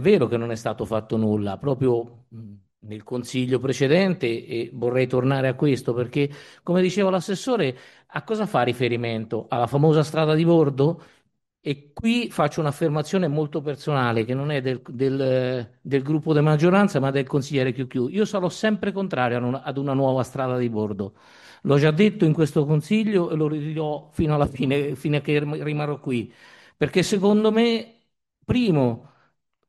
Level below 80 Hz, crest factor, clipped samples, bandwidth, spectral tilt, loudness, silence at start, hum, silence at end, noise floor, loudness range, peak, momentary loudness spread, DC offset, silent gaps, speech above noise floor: -54 dBFS; 18 dB; under 0.1%; 12.5 kHz; -7 dB/octave; -23 LUFS; 0 s; none; 0.7 s; -68 dBFS; 3 LU; -4 dBFS; 10 LU; under 0.1%; none; 46 dB